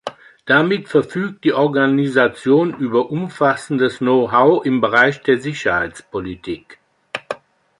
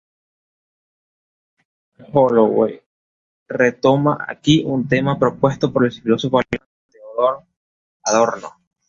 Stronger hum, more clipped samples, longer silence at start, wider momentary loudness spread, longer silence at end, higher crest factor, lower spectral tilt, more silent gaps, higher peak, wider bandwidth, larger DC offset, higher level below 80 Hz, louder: neither; neither; second, 0.05 s vs 2.15 s; first, 16 LU vs 12 LU; about the same, 0.45 s vs 0.4 s; about the same, 16 dB vs 18 dB; about the same, -6.5 dB/octave vs -5.5 dB/octave; second, none vs 2.86-3.46 s, 6.66-6.89 s, 7.57-8.00 s; about the same, 0 dBFS vs -2 dBFS; first, 11 kHz vs 7.6 kHz; neither; about the same, -54 dBFS vs -52 dBFS; about the same, -17 LUFS vs -18 LUFS